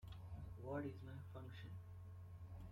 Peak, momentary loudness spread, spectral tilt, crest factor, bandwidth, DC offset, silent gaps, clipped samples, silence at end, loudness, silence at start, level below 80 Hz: -36 dBFS; 9 LU; -8 dB/octave; 16 dB; 15.5 kHz; under 0.1%; none; under 0.1%; 0 s; -54 LUFS; 0 s; -64 dBFS